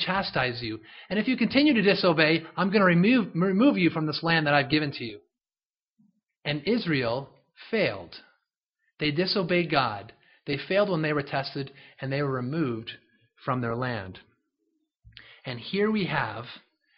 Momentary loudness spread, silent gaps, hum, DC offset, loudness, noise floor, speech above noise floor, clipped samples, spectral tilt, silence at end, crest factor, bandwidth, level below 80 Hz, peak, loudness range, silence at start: 17 LU; 5.67-5.73 s, 8.63-8.67 s; none; under 0.1%; -26 LUFS; under -90 dBFS; over 64 dB; under 0.1%; -4 dB/octave; 0.4 s; 22 dB; 5.8 kHz; -62 dBFS; -4 dBFS; 10 LU; 0 s